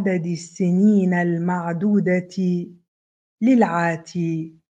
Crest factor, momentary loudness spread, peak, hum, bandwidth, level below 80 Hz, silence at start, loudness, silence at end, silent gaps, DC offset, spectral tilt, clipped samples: 16 dB; 9 LU; -4 dBFS; none; 8.8 kHz; -70 dBFS; 0 s; -21 LUFS; 0.3 s; 2.88-3.38 s; under 0.1%; -8 dB/octave; under 0.1%